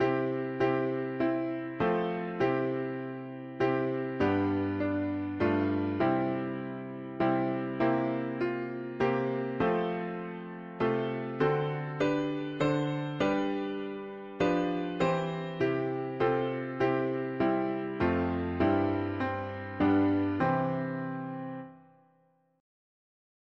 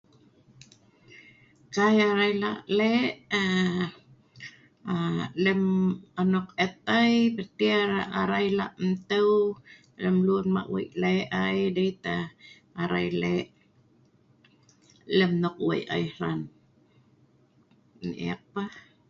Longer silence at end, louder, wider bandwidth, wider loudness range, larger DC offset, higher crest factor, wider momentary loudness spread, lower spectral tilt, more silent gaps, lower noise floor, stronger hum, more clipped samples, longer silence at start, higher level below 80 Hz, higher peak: first, 1.8 s vs 0.3 s; second, -31 LUFS vs -26 LUFS; about the same, 7.4 kHz vs 7.4 kHz; second, 2 LU vs 6 LU; neither; about the same, 16 dB vs 18 dB; second, 9 LU vs 13 LU; first, -8 dB/octave vs -6.5 dB/octave; neither; first, -69 dBFS vs -62 dBFS; neither; neither; second, 0 s vs 1.15 s; about the same, -60 dBFS vs -62 dBFS; second, -14 dBFS vs -10 dBFS